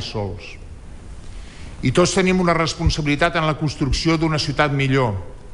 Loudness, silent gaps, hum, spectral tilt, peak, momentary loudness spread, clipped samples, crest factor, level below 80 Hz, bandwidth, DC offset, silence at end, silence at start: -19 LUFS; none; none; -5 dB/octave; -4 dBFS; 22 LU; under 0.1%; 16 dB; -32 dBFS; 11 kHz; under 0.1%; 0 s; 0 s